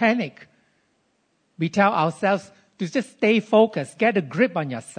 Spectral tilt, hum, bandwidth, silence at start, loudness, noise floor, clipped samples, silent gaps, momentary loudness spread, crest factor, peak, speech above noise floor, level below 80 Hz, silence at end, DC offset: -6 dB/octave; none; 9.6 kHz; 0 s; -22 LUFS; -68 dBFS; under 0.1%; none; 9 LU; 18 dB; -4 dBFS; 47 dB; -74 dBFS; 0.05 s; under 0.1%